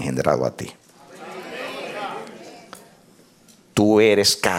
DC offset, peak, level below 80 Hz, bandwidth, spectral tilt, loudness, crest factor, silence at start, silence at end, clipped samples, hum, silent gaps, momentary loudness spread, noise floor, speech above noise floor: under 0.1%; -2 dBFS; -56 dBFS; 17 kHz; -4 dB/octave; -20 LUFS; 20 dB; 0 s; 0 s; under 0.1%; none; none; 25 LU; -53 dBFS; 35 dB